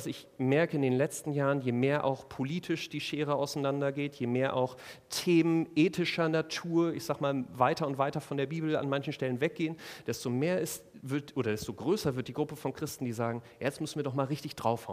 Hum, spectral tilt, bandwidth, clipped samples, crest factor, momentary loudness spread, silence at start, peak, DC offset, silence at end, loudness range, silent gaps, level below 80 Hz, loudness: none; -6 dB/octave; 15.5 kHz; under 0.1%; 20 dB; 8 LU; 0 s; -12 dBFS; under 0.1%; 0 s; 4 LU; none; -68 dBFS; -32 LUFS